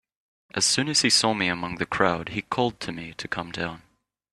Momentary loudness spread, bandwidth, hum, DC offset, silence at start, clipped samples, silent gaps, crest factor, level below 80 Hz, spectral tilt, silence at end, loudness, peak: 14 LU; 13.5 kHz; none; under 0.1%; 0.55 s; under 0.1%; none; 24 dB; -58 dBFS; -2.5 dB/octave; 0.55 s; -24 LUFS; -2 dBFS